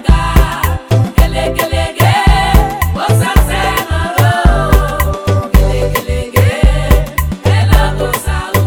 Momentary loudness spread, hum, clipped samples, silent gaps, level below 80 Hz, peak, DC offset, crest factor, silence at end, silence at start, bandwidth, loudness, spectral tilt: 5 LU; none; 0.6%; none; -14 dBFS; 0 dBFS; 0.2%; 10 dB; 0 s; 0 s; 19.5 kHz; -12 LUFS; -5.5 dB/octave